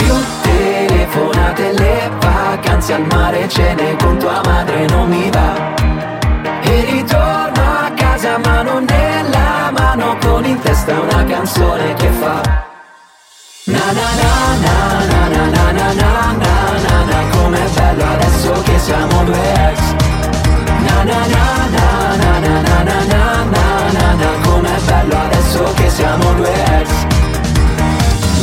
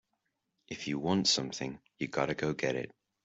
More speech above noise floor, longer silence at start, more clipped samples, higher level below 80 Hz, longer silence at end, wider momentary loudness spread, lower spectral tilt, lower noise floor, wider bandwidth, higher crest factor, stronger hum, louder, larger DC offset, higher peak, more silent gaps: second, 31 dB vs 49 dB; second, 0 s vs 0.7 s; neither; first, -16 dBFS vs -66 dBFS; second, 0 s vs 0.35 s; second, 2 LU vs 14 LU; first, -5.5 dB/octave vs -3.5 dB/octave; second, -42 dBFS vs -82 dBFS; first, 16.5 kHz vs 8.2 kHz; second, 12 dB vs 20 dB; neither; first, -13 LUFS vs -33 LUFS; neither; first, 0 dBFS vs -14 dBFS; neither